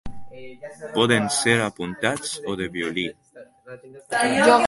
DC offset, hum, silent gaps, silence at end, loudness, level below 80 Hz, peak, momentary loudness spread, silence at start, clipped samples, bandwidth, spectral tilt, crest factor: under 0.1%; none; none; 0 s; -22 LUFS; -52 dBFS; -2 dBFS; 24 LU; 0.05 s; under 0.1%; 11.5 kHz; -3.5 dB/octave; 22 dB